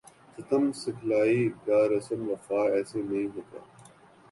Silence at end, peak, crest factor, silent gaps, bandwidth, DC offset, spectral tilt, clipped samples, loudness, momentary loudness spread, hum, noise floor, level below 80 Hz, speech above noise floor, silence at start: 0.5 s; -14 dBFS; 16 dB; none; 11.5 kHz; under 0.1%; -6.5 dB/octave; under 0.1%; -28 LUFS; 15 LU; none; -55 dBFS; -68 dBFS; 27 dB; 0.4 s